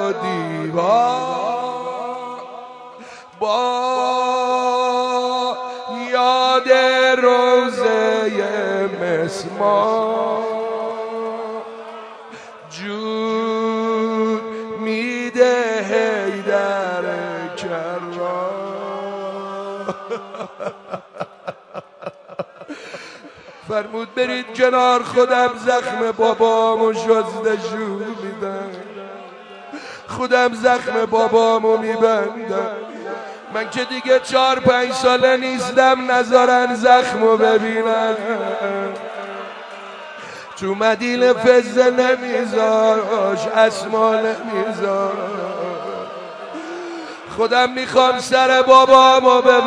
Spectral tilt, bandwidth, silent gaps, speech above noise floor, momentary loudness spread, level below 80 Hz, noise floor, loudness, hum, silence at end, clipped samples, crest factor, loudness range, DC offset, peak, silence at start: -4 dB/octave; 10.5 kHz; none; 25 dB; 19 LU; -64 dBFS; -40 dBFS; -17 LUFS; none; 0 s; under 0.1%; 18 dB; 11 LU; under 0.1%; 0 dBFS; 0 s